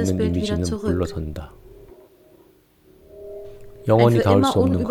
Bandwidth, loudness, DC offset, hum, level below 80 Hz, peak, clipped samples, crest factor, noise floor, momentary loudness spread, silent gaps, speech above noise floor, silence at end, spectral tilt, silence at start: 16 kHz; -20 LUFS; under 0.1%; none; -42 dBFS; -2 dBFS; under 0.1%; 18 dB; -55 dBFS; 23 LU; none; 36 dB; 0 s; -7 dB/octave; 0 s